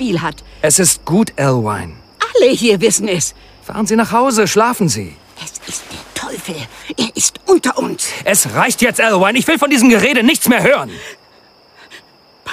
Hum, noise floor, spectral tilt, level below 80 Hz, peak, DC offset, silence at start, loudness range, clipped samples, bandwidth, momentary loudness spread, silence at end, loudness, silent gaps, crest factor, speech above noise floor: none; -47 dBFS; -3.5 dB/octave; -46 dBFS; 0 dBFS; under 0.1%; 0 s; 6 LU; under 0.1%; 16 kHz; 16 LU; 0 s; -13 LUFS; none; 14 dB; 33 dB